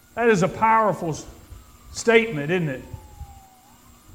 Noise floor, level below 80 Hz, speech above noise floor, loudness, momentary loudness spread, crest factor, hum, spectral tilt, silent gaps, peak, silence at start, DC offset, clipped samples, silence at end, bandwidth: -51 dBFS; -48 dBFS; 30 dB; -21 LUFS; 23 LU; 22 dB; none; -5 dB/octave; none; -2 dBFS; 0.15 s; under 0.1%; under 0.1%; 0.8 s; 16 kHz